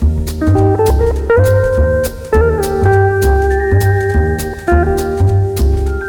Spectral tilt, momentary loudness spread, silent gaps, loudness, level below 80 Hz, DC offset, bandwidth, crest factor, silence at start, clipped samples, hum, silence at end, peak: -7 dB/octave; 4 LU; none; -13 LUFS; -18 dBFS; under 0.1%; 19.5 kHz; 10 dB; 0 s; under 0.1%; none; 0 s; -2 dBFS